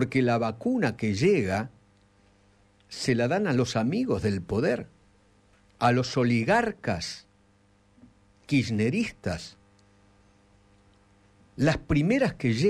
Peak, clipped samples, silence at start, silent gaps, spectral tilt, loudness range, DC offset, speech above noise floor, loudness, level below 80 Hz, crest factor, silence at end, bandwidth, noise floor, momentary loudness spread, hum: -12 dBFS; under 0.1%; 0 s; none; -6 dB/octave; 5 LU; under 0.1%; 37 dB; -26 LUFS; -52 dBFS; 16 dB; 0 s; 12.5 kHz; -62 dBFS; 11 LU; none